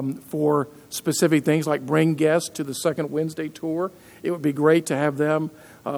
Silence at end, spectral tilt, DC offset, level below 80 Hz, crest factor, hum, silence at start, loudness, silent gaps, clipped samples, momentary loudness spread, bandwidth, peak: 0 s; -5.5 dB/octave; under 0.1%; -68 dBFS; 18 dB; none; 0 s; -23 LUFS; none; under 0.1%; 10 LU; over 20 kHz; -4 dBFS